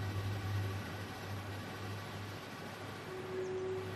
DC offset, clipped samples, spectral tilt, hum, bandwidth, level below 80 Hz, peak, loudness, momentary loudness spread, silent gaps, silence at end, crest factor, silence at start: under 0.1%; under 0.1%; -6 dB/octave; none; 15 kHz; -64 dBFS; -28 dBFS; -42 LUFS; 7 LU; none; 0 s; 14 dB; 0 s